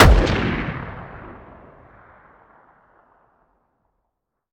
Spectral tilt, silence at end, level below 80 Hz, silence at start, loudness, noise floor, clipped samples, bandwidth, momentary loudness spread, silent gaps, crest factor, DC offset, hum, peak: -6 dB/octave; 3.2 s; -26 dBFS; 0 s; -20 LUFS; -78 dBFS; under 0.1%; 16.5 kHz; 27 LU; none; 22 dB; under 0.1%; none; 0 dBFS